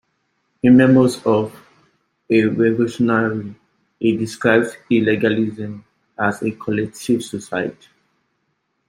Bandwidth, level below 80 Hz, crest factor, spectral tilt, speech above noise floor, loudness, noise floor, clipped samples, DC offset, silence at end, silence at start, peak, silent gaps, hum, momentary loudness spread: 13 kHz; -58 dBFS; 18 dB; -6.5 dB/octave; 53 dB; -18 LUFS; -70 dBFS; under 0.1%; under 0.1%; 1.2 s; 0.65 s; -2 dBFS; none; none; 13 LU